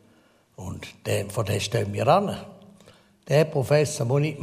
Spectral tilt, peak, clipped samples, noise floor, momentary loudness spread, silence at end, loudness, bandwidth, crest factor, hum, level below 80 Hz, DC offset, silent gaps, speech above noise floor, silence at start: -5.5 dB/octave; -6 dBFS; under 0.1%; -60 dBFS; 16 LU; 0 s; -24 LUFS; 15.5 kHz; 20 dB; none; -58 dBFS; under 0.1%; none; 36 dB; 0.6 s